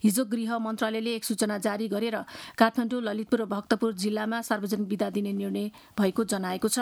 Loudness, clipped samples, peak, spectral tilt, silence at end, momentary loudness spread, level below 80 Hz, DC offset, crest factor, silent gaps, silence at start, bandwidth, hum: -28 LUFS; under 0.1%; -6 dBFS; -4.5 dB/octave; 0 s; 6 LU; -68 dBFS; under 0.1%; 22 dB; none; 0.05 s; 18.5 kHz; none